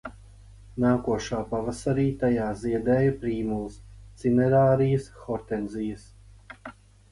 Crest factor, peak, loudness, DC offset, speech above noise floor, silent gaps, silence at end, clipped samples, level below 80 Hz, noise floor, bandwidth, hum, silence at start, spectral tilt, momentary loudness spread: 18 dB; -10 dBFS; -26 LUFS; under 0.1%; 24 dB; none; 0.4 s; under 0.1%; -48 dBFS; -49 dBFS; 11.5 kHz; 50 Hz at -45 dBFS; 0.05 s; -8 dB/octave; 20 LU